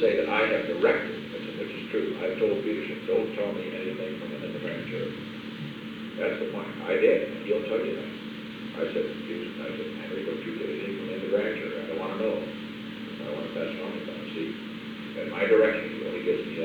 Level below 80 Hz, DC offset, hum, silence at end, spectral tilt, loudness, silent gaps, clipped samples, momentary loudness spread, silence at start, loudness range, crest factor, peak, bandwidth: -64 dBFS; under 0.1%; none; 0 s; -6.5 dB/octave; -30 LUFS; none; under 0.1%; 13 LU; 0 s; 5 LU; 20 dB; -10 dBFS; 19 kHz